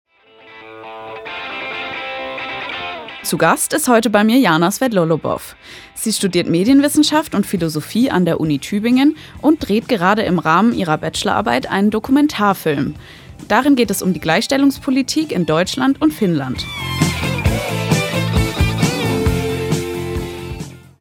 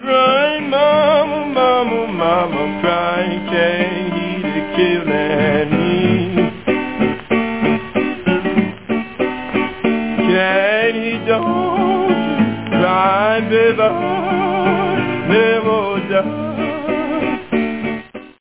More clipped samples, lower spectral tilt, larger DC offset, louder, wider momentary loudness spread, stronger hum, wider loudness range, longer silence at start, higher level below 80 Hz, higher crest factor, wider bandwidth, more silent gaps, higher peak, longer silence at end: neither; second, -5 dB/octave vs -10 dB/octave; second, under 0.1% vs 0.6%; about the same, -16 LUFS vs -16 LUFS; first, 12 LU vs 7 LU; neither; about the same, 3 LU vs 3 LU; first, 0.45 s vs 0 s; first, -36 dBFS vs -48 dBFS; about the same, 16 dB vs 14 dB; first, 19.5 kHz vs 4 kHz; neither; about the same, 0 dBFS vs -2 dBFS; about the same, 0.2 s vs 0.1 s